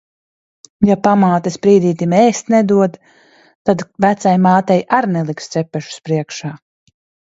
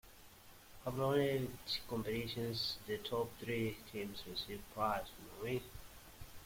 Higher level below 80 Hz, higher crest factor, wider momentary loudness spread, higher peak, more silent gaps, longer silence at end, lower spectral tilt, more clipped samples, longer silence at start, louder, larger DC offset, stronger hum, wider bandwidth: first, -54 dBFS vs -62 dBFS; about the same, 16 dB vs 18 dB; second, 10 LU vs 20 LU; first, 0 dBFS vs -22 dBFS; first, 3.55-3.65 s vs none; first, 0.8 s vs 0 s; first, -6.5 dB/octave vs -5 dB/octave; neither; first, 0.8 s vs 0.05 s; first, -14 LUFS vs -40 LUFS; neither; neither; second, 8 kHz vs 16.5 kHz